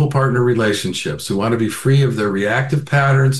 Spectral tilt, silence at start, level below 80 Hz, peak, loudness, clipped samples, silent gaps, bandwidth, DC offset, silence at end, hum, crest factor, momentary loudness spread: -6 dB/octave; 0 s; -50 dBFS; -2 dBFS; -17 LUFS; under 0.1%; none; 12.5 kHz; 0.5%; 0 s; none; 14 dB; 5 LU